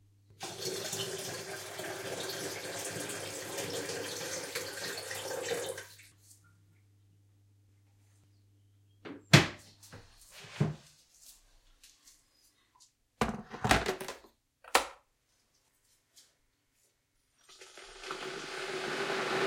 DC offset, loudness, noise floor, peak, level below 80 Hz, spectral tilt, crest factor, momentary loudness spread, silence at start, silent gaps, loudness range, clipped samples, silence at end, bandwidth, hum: under 0.1%; -34 LUFS; -75 dBFS; -4 dBFS; -58 dBFS; -3.5 dB/octave; 34 dB; 23 LU; 0.3 s; none; 11 LU; under 0.1%; 0 s; 16.5 kHz; none